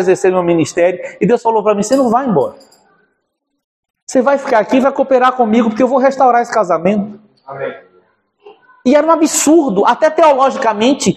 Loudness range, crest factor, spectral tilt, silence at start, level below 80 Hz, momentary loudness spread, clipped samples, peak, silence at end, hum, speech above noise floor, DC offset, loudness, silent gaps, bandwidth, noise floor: 4 LU; 12 dB; -5 dB/octave; 0 s; -58 dBFS; 8 LU; under 0.1%; 0 dBFS; 0 s; none; 58 dB; under 0.1%; -12 LUFS; 3.64-3.83 s, 3.90-3.94 s, 4.02-4.07 s; 14 kHz; -69 dBFS